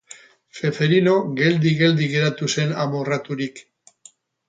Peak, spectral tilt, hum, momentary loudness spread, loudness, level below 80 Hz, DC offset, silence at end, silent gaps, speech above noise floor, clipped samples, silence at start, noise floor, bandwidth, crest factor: -4 dBFS; -5.5 dB/octave; none; 9 LU; -20 LUFS; -62 dBFS; under 0.1%; 0.9 s; none; 32 dB; under 0.1%; 0.55 s; -52 dBFS; 9 kHz; 16 dB